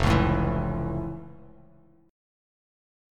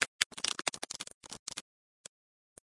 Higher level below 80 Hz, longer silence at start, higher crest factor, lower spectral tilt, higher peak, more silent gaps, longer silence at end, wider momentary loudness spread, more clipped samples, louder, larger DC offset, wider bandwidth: first, -36 dBFS vs -76 dBFS; about the same, 0 s vs 0 s; second, 20 dB vs 36 dB; first, -7 dB/octave vs 1 dB/octave; second, -8 dBFS vs -4 dBFS; second, none vs 0.07-0.19 s, 0.26-0.30 s, 1.14-1.21 s, 1.39-1.46 s; first, 1.65 s vs 1.05 s; second, 18 LU vs 23 LU; neither; first, -27 LUFS vs -36 LUFS; neither; about the same, 13 kHz vs 12 kHz